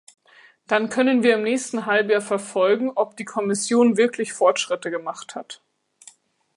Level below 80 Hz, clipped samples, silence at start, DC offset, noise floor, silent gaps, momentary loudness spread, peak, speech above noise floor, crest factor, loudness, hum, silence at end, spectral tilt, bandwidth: -74 dBFS; under 0.1%; 0.7 s; under 0.1%; -52 dBFS; none; 14 LU; -4 dBFS; 31 dB; 18 dB; -21 LUFS; none; 1 s; -3.5 dB/octave; 11.5 kHz